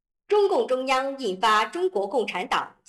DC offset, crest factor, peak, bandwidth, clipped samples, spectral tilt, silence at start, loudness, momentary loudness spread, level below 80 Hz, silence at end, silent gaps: under 0.1%; 12 dB; -12 dBFS; 12.5 kHz; under 0.1%; -3.5 dB/octave; 0.3 s; -24 LUFS; 5 LU; -66 dBFS; 0.2 s; none